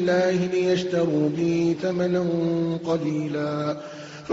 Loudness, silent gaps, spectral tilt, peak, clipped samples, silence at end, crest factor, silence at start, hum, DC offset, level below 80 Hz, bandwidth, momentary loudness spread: -24 LUFS; none; -6.5 dB/octave; -10 dBFS; under 0.1%; 0 s; 14 dB; 0 s; none; under 0.1%; -62 dBFS; 7.8 kHz; 6 LU